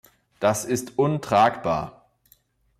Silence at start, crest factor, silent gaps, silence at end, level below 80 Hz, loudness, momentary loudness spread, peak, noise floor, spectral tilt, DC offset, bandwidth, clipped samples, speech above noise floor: 0.4 s; 18 dB; none; 0.9 s; -56 dBFS; -23 LUFS; 8 LU; -8 dBFS; -61 dBFS; -5 dB/octave; under 0.1%; 16 kHz; under 0.1%; 39 dB